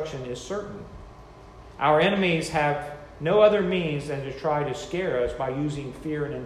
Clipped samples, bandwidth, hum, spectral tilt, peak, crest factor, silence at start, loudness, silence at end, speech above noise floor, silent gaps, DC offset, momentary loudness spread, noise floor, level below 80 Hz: under 0.1%; 12.5 kHz; none; -6 dB/octave; -6 dBFS; 20 dB; 0 s; -25 LUFS; 0 s; 21 dB; none; under 0.1%; 17 LU; -46 dBFS; -50 dBFS